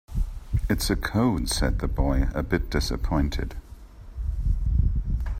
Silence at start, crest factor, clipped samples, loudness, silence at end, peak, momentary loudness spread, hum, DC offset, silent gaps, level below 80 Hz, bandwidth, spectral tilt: 0.1 s; 16 dB; under 0.1%; -27 LUFS; 0 s; -8 dBFS; 10 LU; none; under 0.1%; none; -28 dBFS; 16 kHz; -5.5 dB/octave